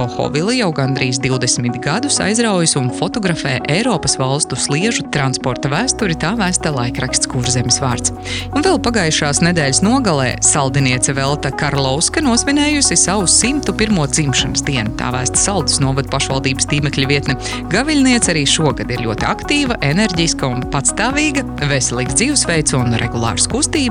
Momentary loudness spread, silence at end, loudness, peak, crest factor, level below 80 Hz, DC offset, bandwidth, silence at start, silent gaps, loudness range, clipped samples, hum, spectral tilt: 6 LU; 0 s; -15 LUFS; 0 dBFS; 14 dB; -32 dBFS; under 0.1%; 13.5 kHz; 0 s; none; 3 LU; under 0.1%; none; -3.5 dB/octave